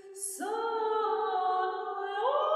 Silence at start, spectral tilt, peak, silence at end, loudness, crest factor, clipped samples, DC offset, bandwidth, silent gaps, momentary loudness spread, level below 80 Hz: 0.05 s; 0 dB/octave; -18 dBFS; 0 s; -31 LUFS; 14 dB; under 0.1%; under 0.1%; 14 kHz; none; 6 LU; -90 dBFS